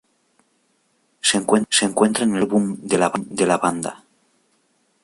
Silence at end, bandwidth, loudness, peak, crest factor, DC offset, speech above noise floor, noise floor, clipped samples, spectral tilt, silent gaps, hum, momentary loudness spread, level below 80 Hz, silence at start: 1.1 s; 11.5 kHz; -19 LUFS; -2 dBFS; 18 dB; under 0.1%; 46 dB; -65 dBFS; under 0.1%; -3.5 dB/octave; none; none; 5 LU; -62 dBFS; 1.25 s